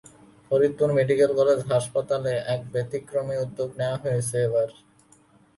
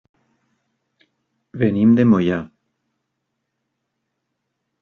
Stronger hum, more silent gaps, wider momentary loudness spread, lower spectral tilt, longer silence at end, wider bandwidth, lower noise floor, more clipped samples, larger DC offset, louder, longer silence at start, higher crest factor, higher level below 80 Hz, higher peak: neither; neither; second, 9 LU vs 22 LU; second, -6 dB/octave vs -8 dB/octave; second, 0.85 s vs 2.35 s; first, 11.5 kHz vs 6 kHz; second, -57 dBFS vs -76 dBFS; neither; neither; second, -25 LUFS vs -17 LUFS; second, 0.5 s vs 1.55 s; about the same, 16 dB vs 18 dB; about the same, -62 dBFS vs -60 dBFS; second, -8 dBFS vs -4 dBFS